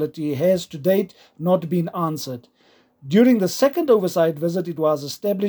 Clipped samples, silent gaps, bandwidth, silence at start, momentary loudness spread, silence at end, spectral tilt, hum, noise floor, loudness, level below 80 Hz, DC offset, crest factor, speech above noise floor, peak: under 0.1%; none; over 20 kHz; 0 s; 9 LU; 0 s; -6.5 dB/octave; none; -57 dBFS; -20 LUFS; -68 dBFS; under 0.1%; 16 dB; 37 dB; -4 dBFS